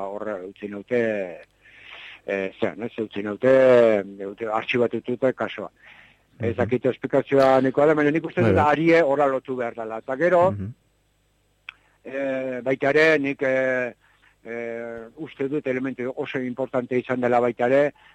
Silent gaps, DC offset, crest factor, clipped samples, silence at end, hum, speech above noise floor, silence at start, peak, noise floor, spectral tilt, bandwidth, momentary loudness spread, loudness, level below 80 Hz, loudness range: none; under 0.1%; 16 dB; under 0.1%; 0.25 s; 50 Hz at -60 dBFS; 43 dB; 0 s; -8 dBFS; -65 dBFS; -7 dB/octave; 9 kHz; 17 LU; -22 LUFS; -62 dBFS; 7 LU